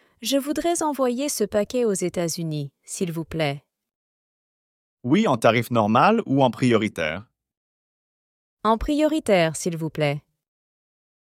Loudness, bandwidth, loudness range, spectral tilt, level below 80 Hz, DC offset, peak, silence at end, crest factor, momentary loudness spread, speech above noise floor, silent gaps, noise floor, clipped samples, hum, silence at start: -22 LUFS; 16.5 kHz; 6 LU; -5 dB/octave; -48 dBFS; under 0.1%; -4 dBFS; 1.1 s; 20 dB; 10 LU; over 68 dB; 3.95-4.97 s, 7.57-8.57 s; under -90 dBFS; under 0.1%; none; 0.2 s